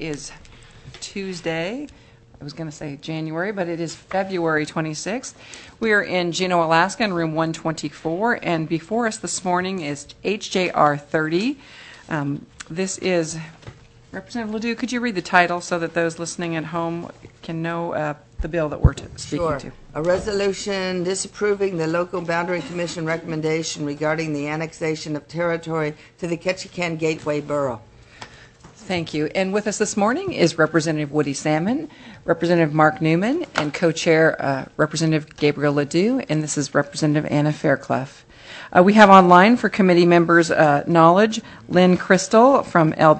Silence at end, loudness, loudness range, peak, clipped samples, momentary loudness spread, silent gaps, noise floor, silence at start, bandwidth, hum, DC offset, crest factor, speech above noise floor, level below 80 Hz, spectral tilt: 0 s; -20 LUFS; 11 LU; 0 dBFS; under 0.1%; 16 LU; none; -46 dBFS; 0 s; 8.6 kHz; none; under 0.1%; 20 dB; 26 dB; -42 dBFS; -5.5 dB/octave